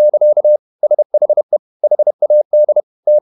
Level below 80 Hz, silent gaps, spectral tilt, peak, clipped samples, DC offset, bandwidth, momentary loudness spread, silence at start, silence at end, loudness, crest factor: -80 dBFS; 0.59-0.79 s, 1.05-1.10 s, 1.43-1.49 s, 1.59-1.80 s, 2.14-2.19 s, 2.45-2.50 s, 2.83-3.03 s; -11 dB/octave; -4 dBFS; under 0.1%; under 0.1%; 1.1 kHz; 5 LU; 0 s; 0 s; -13 LUFS; 8 dB